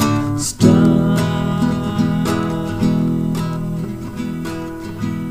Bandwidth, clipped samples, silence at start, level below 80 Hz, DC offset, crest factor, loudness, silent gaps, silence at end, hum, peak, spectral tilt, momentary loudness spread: 15.5 kHz; under 0.1%; 0 s; -38 dBFS; under 0.1%; 18 dB; -18 LUFS; none; 0 s; none; 0 dBFS; -6.5 dB/octave; 12 LU